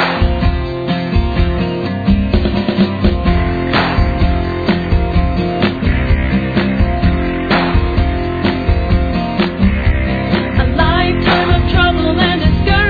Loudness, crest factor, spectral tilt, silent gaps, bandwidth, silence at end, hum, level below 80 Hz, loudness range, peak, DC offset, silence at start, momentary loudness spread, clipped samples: -14 LUFS; 12 dB; -8.5 dB/octave; none; 4.9 kHz; 0 s; none; -18 dBFS; 2 LU; 0 dBFS; under 0.1%; 0 s; 4 LU; under 0.1%